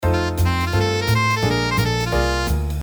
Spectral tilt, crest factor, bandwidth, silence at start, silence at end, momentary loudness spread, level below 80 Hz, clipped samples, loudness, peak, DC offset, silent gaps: -5 dB/octave; 12 dB; over 20 kHz; 0 s; 0 s; 2 LU; -28 dBFS; under 0.1%; -19 LUFS; -6 dBFS; under 0.1%; none